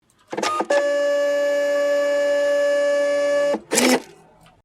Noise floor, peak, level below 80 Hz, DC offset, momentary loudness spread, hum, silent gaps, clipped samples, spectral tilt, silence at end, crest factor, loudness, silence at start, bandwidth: -51 dBFS; 0 dBFS; -68 dBFS; under 0.1%; 5 LU; none; none; under 0.1%; -2 dB/octave; 0.6 s; 20 dB; -20 LUFS; 0.3 s; 15.5 kHz